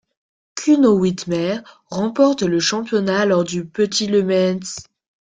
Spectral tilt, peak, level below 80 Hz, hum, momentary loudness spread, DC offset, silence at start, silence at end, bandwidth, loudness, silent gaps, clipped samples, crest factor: -5 dB/octave; -2 dBFS; -58 dBFS; none; 13 LU; under 0.1%; 0.55 s; 0.5 s; 9.4 kHz; -18 LUFS; none; under 0.1%; 16 dB